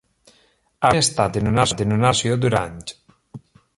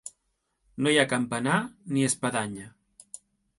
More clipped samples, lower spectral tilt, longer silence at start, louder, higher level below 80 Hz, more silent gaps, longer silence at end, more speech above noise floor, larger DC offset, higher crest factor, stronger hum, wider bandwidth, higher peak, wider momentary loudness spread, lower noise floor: neither; about the same, -4.5 dB/octave vs -4 dB/octave; first, 0.8 s vs 0.05 s; first, -19 LUFS vs -26 LUFS; first, -44 dBFS vs -66 dBFS; neither; second, 0.4 s vs 0.9 s; second, 41 dB vs 50 dB; neither; about the same, 18 dB vs 22 dB; neither; about the same, 11.5 kHz vs 11.5 kHz; first, -2 dBFS vs -6 dBFS; second, 12 LU vs 23 LU; second, -60 dBFS vs -77 dBFS